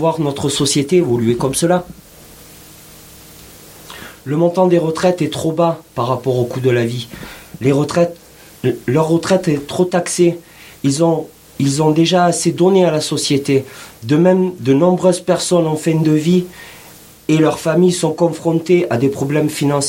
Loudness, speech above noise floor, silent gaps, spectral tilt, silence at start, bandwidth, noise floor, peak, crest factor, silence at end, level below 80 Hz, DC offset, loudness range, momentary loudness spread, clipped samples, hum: -15 LUFS; 26 dB; none; -5.5 dB/octave; 0 s; 17 kHz; -40 dBFS; 0 dBFS; 16 dB; 0 s; -50 dBFS; under 0.1%; 5 LU; 9 LU; under 0.1%; none